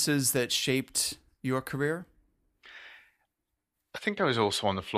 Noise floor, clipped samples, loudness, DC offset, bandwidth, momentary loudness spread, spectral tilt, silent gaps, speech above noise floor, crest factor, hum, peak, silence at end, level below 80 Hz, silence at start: -84 dBFS; under 0.1%; -29 LUFS; under 0.1%; 15.5 kHz; 18 LU; -3.5 dB/octave; none; 55 dB; 20 dB; none; -12 dBFS; 0 s; -64 dBFS; 0 s